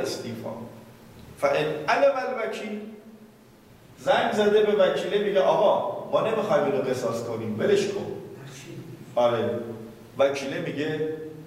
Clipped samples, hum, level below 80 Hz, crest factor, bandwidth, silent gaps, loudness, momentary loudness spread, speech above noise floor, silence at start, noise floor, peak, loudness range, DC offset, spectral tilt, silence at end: under 0.1%; none; -64 dBFS; 16 dB; 15.5 kHz; none; -25 LUFS; 19 LU; 28 dB; 0 s; -52 dBFS; -10 dBFS; 5 LU; under 0.1%; -5 dB/octave; 0 s